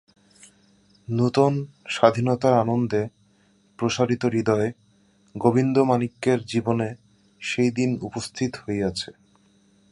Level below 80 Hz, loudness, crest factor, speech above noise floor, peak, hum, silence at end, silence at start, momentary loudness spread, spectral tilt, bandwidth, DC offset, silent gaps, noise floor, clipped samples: -58 dBFS; -23 LUFS; 22 dB; 38 dB; -2 dBFS; none; 0.8 s; 1.1 s; 11 LU; -6.5 dB/octave; 11.5 kHz; under 0.1%; none; -61 dBFS; under 0.1%